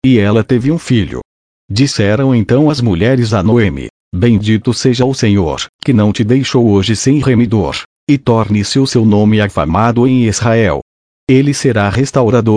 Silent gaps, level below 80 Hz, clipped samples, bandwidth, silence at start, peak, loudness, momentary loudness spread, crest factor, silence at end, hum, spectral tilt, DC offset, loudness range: 1.25-1.68 s, 3.90-4.11 s, 5.69-5.79 s, 7.85-8.07 s, 10.82-11.27 s; -36 dBFS; under 0.1%; 10.5 kHz; 0.05 s; 0 dBFS; -12 LUFS; 5 LU; 10 dB; 0 s; none; -6 dB/octave; under 0.1%; 1 LU